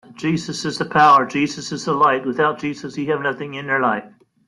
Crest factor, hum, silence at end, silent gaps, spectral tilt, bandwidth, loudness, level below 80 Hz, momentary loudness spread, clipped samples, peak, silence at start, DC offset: 16 dB; none; 0.4 s; none; -5 dB/octave; 11.5 kHz; -19 LUFS; -60 dBFS; 14 LU; under 0.1%; -2 dBFS; 0.2 s; under 0.1%